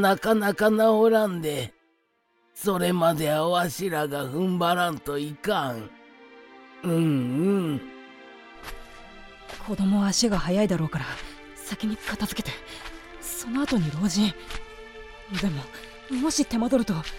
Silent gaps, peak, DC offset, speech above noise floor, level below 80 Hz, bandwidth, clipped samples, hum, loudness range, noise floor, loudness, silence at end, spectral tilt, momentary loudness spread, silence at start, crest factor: none; -8 dBFS; under 0.1%; 44 dB; -48 dBFS; 17 kHz; under 0.1%; none; 5 LU; -69 dBFS; -25 LUFS; 0 s; -5 dB/octave; 21 LU; 0 s; 18 dB